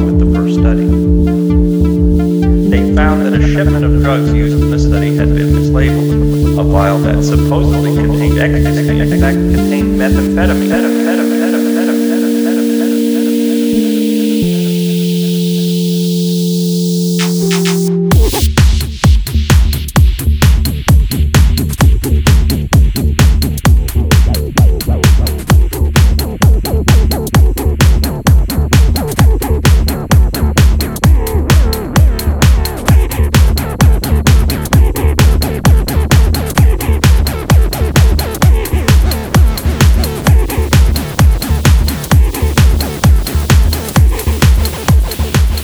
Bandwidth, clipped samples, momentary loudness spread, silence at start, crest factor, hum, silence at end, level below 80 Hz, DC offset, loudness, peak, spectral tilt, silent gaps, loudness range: over 20 kHz; under 0.1%; 2 LU; 0 s; 10 dB; none; 0 s; -12 dBFS; under 0.1%; -11 LUFS; 0 dBFS; -6 dB/octave; none; 1 LU